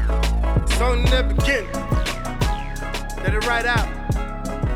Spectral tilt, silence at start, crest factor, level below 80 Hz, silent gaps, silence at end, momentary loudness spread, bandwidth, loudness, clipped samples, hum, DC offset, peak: -5 dB/octave; 0 s; 14 dB; -22 dBFS; none; 0 s; 9 LU; 14.5 kHz; -22 LUFS; under 0.1%; none; under 0.1%; -6 dBFS